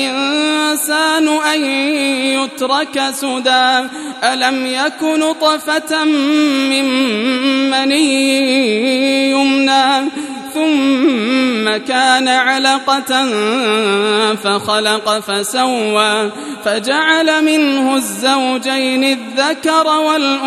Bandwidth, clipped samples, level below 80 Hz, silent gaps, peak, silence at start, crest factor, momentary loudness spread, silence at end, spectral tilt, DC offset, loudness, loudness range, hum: 13.5 kHz; under 0.1%; -68 dBFS; none; 0 dBFS; 0 s; 14 dB; 5 LU; 0 s; -2 dB/octave; under 0.1%; -13 LUFS; 2 LU; none